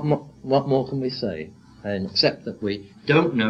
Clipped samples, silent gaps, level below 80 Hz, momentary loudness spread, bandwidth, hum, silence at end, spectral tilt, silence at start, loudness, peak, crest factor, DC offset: under 0.1%; none; -58 dBFS; 10 LU; 7.6 kHz; none; 0 s; -6.5 dB/octave; 0 s; -24 LUFS; -4 dBFS; 18 dB; under 0.1%